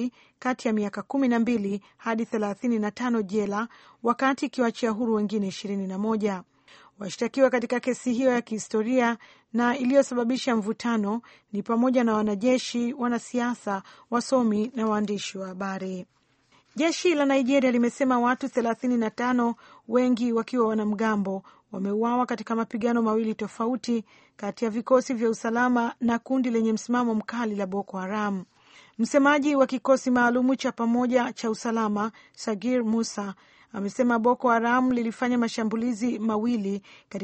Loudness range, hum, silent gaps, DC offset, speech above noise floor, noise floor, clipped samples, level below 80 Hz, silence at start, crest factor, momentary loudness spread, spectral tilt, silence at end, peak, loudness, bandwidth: 3 LU; none; none; under 0.1%; 38 dB; -63 dBFS; under 0.1%; -68 dBFS; 0 s; 18 dB; 10 LU; -5.5 dB/octave; 0 s; -8 dBFS; -26 LUFS; 8.4 kHz